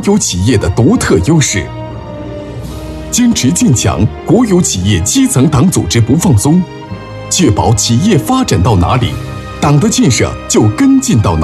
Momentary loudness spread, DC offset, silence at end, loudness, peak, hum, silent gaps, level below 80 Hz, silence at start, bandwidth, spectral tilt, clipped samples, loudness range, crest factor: 15 LU; under 0.1%; 0 s; -10 LUFS; 0 dBFS; none; none; -28 dBFS; 0 s; 13.5 kHz; -5 dB/octave; under 0.1%; 3 LU; 10 dB